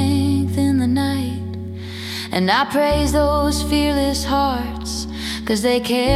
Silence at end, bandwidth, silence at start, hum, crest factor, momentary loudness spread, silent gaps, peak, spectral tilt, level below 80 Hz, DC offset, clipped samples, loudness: 0 s; 16 kHz; 0 s; none; 16 dB; 10 LU; none; -2 dBFS; -5 dB/octave; -32 dBFS; under 0.1%; under 0.1%; -19 LUFS